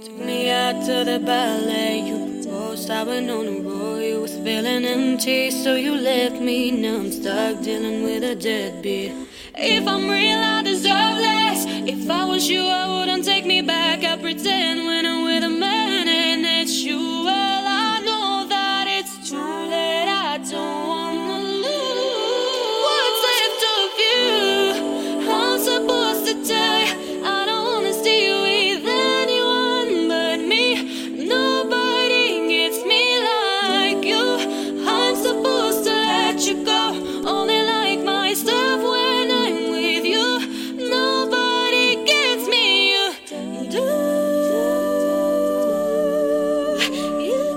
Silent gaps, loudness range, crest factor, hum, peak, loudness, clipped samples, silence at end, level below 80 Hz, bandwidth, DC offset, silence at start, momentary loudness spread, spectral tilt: none; 5 LU; 18 dB; none; -2 dBFS; -19 LUFS; under 0.1%; 0 s; -60 dBFS; 17 kHz; under 0.1%; 0 s; 8 LU; -2.5 dB/octave